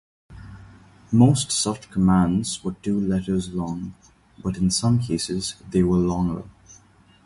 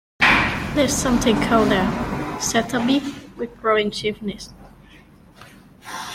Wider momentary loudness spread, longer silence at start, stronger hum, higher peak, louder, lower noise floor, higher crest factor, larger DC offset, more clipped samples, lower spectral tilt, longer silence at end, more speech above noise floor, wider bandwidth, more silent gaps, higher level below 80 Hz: about the same, 14 LU vs 16 LU; about the same, 0.3 s vs 0.2 s; neither; about the same, -4 dBFS vs -2 dBFS; about the same, -22 LUFS vs -20 LUFS; first, -54 dBFS vs -48 dBFS; about the same, 20 dB vs 18 dB; neither; neither; first, -5.5 dB/octave vs -4 dB/octave; first, 0.55 s vs 0 s; first, 32 dB vs 27 dB; second, 11.5 kHz vs 16 kHz; neither; about the same, -44 dBFS vs -40 dBFS